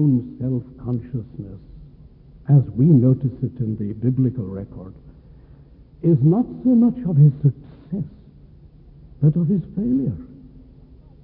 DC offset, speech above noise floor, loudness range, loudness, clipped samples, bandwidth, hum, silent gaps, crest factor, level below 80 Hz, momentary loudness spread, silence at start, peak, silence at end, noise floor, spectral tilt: under 0.1%; 28 dB; 5 LU; -20 LUFS; under 0.1%; 1.9 kHz; none; none; 16 dB; -48 dBFS; 20 LU; 0 s; -4 dBFS; 0.9 s; -46 dBFS; -15.5 dB/octave